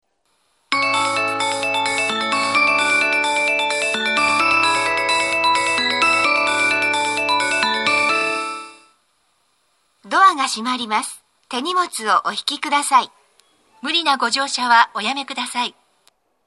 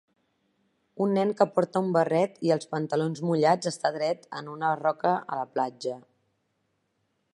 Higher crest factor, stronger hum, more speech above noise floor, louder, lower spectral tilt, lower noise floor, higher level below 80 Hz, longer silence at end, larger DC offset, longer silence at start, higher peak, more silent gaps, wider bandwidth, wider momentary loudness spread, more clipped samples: about the same, 20 dB vs 22 dB; neither; about the same, 46 dB vs 49 dB; first, -17 LUFS vs -27 LUFS; second, -1 dB/octave vs -6 dB/octave; second, -66 dBFS vs -75 dBFS; first, -64 dBFS vs -78 dBFS; second, 0.75 s vs 1.35 s; neither; second, 0.7 s vs 0.95 s; first, 0 dBFS vs -6 dBFS; neither; first, 13 kHz vs 11.5 kHz; about the same, 8 LU vs 8 LU; neither